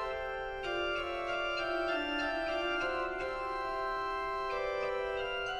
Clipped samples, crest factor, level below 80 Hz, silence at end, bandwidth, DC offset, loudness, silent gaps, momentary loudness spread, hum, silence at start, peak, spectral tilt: under 0.1%; 12 dB; -54 dBFS; 0 s; 13.5 kHz; under 0.1%; -35 LUFS; none; 4 LU; none; 0 s; -22 dBFS; -4 dB/octave